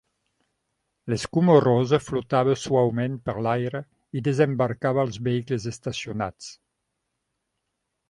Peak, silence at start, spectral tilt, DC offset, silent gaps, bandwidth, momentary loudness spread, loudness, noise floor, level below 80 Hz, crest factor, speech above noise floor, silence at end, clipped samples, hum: -4 dBFS; 1.05 s; -6.5 dB/octave; under 0.1%; none; 11.5 kHz; 13 LU; -24 LUFS; -79 dBFS; -56 dBFS; 22 dB; 56 dB; 1.55 s; under 0.1%; none